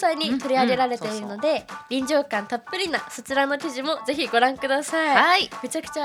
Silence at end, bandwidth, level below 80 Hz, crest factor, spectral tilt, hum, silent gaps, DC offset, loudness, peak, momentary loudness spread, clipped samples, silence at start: 0 s; 19 kHz; -64 dBFS; 22 dB; -3 dB/octave; none; none; under 0.1%; -23 LUFS; -2 dBFS; 10 LU; under 0.1%; 0 s